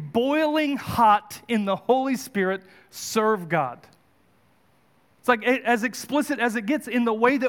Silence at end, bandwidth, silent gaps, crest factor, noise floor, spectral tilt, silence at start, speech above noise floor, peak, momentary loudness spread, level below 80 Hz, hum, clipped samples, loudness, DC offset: 0 s; 18 kHz; none; 18 dB; -62 dBFS; -4.5 dB/octave; 0 s; 39 dB; -6 dBFS; 7 LU; -64 dBFS; none; under 0.1%; -23 LUFS; under 0.1%